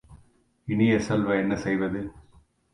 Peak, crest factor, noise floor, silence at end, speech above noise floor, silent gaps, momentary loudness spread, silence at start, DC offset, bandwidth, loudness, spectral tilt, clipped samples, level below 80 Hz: -10 dBFS; 16 dB; -60 dBFS; 0.5 s; 36 dB; none; 14 LU; 0.1 s; under 0.1%; 11 kHz; -25 LUFS; -7 dB/octave; under 0.1%; -52 dBFS